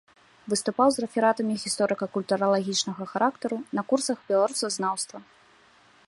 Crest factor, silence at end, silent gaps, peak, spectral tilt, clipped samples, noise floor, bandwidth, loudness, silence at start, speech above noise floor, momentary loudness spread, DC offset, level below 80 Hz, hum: 20 dB; 0.85 s; none; -8 dBFS; -3.5 dB/octave; under 0.1%; -58 dBFS; 11.5 kHz; -26 LUFS; 0.45 s; 32 dB; 8 LU; under 0.1%; -72 dBFS; none